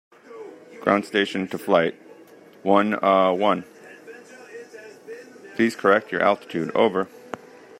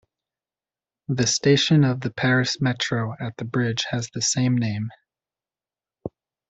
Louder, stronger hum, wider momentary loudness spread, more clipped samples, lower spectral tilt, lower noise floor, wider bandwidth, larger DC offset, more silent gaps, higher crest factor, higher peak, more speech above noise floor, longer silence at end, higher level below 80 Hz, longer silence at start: about the same, -22 LUFS vs -22 LUFS; neither; first, 23 LU vs 18 LU; neither; about the same, -5.5 dB/octave vs -4.5 dB/octave; second, -48 dBFS vs under -90 dBFS; first, 16 kHz vs 8.2 kHz; neither; neither; about the same, 22 dB vs 18 dB; first, -2 dBFS vs -6 dBFS; second, 27 dB vs over 68 dB; about the same, 0.45 s vs 0.4 s; second, -70 dBFS vs -58 dBFS; second, 0.3 s vs 1.1 s